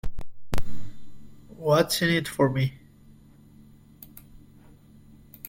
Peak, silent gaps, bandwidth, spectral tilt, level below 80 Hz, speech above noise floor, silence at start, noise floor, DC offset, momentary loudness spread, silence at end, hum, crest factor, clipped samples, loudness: -8 dBFS; none; 16.5 kHz; -5 dB/octave; -42 dBFS; 29 dB; 0.05 s; -52 dBFS; under 0.1%; 25 LU; 1.1 s; none; 18 dB; under 0.1%; -25 LUFS